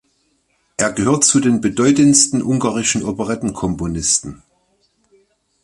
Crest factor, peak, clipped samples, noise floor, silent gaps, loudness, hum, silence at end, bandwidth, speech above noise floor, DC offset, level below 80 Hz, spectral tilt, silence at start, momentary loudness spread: 18 dB; 0 dBFS; under 0.1%; -63 dBFS; none; -15 LUFS; none; 1.3 s; 11.5 kHz; 48 dB; under 0.1%; -44 dBFS; -3.5 dB/octave; 0.8 s; 11 LU